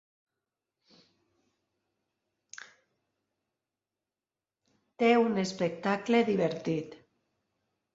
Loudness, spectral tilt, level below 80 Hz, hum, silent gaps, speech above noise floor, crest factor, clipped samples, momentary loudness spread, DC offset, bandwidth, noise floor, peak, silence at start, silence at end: -29 LUFS; -6 dB/octave; -76 dBFS; none; none; over 62 dB; 22 dB; under 0.1%; 23 LU; under 0.1%; 7.8 kHz; under -90 dBFS; -12 dBFS; 5 s; 1 s